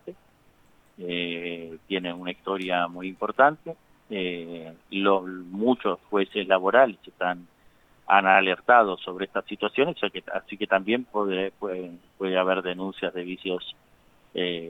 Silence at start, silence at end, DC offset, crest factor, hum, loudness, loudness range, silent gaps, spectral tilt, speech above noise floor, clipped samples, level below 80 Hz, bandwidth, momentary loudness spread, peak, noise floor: 0.05 s; 0 s; under 0.1%; 24 dB; none; -25 LUFS; 7 LU; none; -6.5 dB/octave; 34 dB; under 0.1%; -68 dBFS; 8.8 kHz; 16 LU; -2 dBFS; -59 dBFS